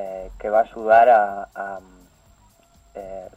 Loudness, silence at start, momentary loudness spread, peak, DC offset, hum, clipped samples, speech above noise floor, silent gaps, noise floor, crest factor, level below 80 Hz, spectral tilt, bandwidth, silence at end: -18 LUFS; 0 s; 23 LU; -2 dBFS; under 0.1%; none; under 0.1%; 36 dB; none; -55 dBFS; 18 dB; -50 dBFS; -5.5 dB/octave; 8 kHz; 0.1 s